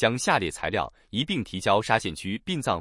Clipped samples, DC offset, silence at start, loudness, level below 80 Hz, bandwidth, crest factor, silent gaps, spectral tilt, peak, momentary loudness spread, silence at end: under 0.1%; under 0.1%; 0 s; -26 LUFS; -52 dBFS; 12 kHz; 20 dB; none; -4 dB/octave; -6 dBFS; 8 LU; 0 s